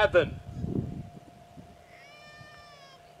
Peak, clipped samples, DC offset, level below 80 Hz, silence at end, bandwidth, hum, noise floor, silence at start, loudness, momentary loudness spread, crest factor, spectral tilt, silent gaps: -10 dBFS; under 0.1%; under 0.1%; -52 dBFS; 0.25 s; 11.5 kHz; none; -52 dBFS; 0 s; -31 LUFS; 22 LU; 22 dB; -6.5 dB/octave; none